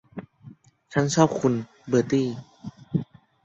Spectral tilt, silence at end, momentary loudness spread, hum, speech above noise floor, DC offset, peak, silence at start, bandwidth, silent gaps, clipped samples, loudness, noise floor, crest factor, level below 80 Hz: -6 dB/octave; 0.4 s; 22 LU; none; 27 dB; under 0.1%; -6 dBFS; 0.15 s; 8.4 kHz; none; under 0.1%; -25 LUFS; -49 dBFS; 20 dB; -60 dBFS